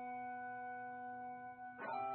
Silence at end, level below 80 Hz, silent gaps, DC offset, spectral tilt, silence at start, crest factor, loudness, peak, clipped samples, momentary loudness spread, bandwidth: 0 s; -88 dBFS; none; under 0.1%; -3.5 dB/octave; 0 s; 14 dB; -48 LUFS; -34 dBFS; under 0.1%; 5 LU; 4.2 kHz